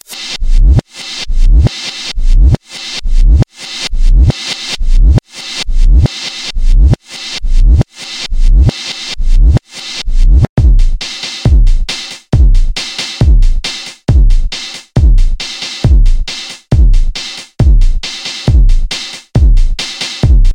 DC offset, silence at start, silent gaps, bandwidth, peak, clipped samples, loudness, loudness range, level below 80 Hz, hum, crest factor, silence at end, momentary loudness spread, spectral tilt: under 0.1%; 0.1 s; 10.49-10.56 s; 10 kHz; 0 dBFS; 1%; -13 LUFS; 1 LU; -8 dBFS; none; 8 dB; 0 s; 9 LU; -5 dB/octave